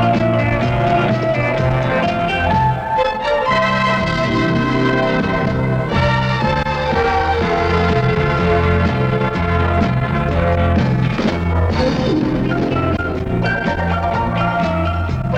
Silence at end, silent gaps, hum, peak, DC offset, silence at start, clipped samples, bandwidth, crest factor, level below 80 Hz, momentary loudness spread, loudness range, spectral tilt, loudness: 0 s; none; none; -4 dBFS; under 0.1%; 0 s; under 0.1%; 8.6 kHz; 12 dB; -28 dBFS; 3 LU; 2 LU; -7.5 dB/octave; -16 LUFS